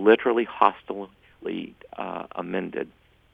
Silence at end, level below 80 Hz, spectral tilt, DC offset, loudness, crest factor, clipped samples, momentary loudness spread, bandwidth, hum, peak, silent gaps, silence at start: 0.45 s; -64 dBFS; -7.5 dB/octave; under 0.1%; -26 LUFS; 24 dB; under 0.1%; 17 LU; 4.6 kHz; none; -2 dBFS; none; 0 s